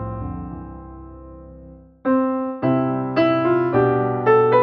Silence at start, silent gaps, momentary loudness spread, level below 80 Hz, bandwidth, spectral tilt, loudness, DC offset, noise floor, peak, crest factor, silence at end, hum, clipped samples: 0 s; none; 22 LU; -44 dBFS; 5.4 kHz; -10 dB/octave; -19 LUFS; under 0.1%; -43 dBFS; -4 dBFS; 16 dB; 0 s; none; under 0.1%